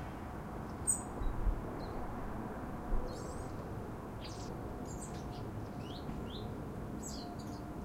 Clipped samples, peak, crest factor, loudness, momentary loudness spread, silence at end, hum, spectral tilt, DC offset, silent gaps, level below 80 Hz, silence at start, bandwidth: under 0.1%; -20 dBFS; 20 dB; -42 LUFS; 7 LU; 0 s; none; -4.5 dB/octave; under 0.1%; none; -44 dBFS; 0 s; 16 kHz